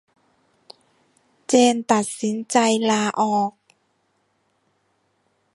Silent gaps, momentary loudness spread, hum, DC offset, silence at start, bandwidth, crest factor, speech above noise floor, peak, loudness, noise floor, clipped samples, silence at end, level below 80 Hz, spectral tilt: none; 9 LU; none; under 0.1%; 1.5 s; 11.5 kHz; 22 dB; 49 dB; -2 dBFS; -20 LUFS; -68 dBFS; under 0.1%; 2.05 s; -72 dBFS; -3.5 dB/octave